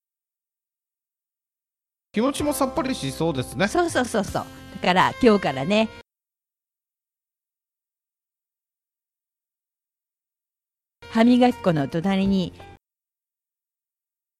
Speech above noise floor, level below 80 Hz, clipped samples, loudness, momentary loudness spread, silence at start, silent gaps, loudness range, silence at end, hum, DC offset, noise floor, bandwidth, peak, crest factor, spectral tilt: over 69 dB; -52 dBFS; under 0.1%; -22 LUFS; 10 LU; 2.15 s; none; 6 LU; 1.65 s; none; under 0.1%; under -90 dBFS; 14.5 kHz; -4 dBFS; 22 dB; -5.5 dB/octave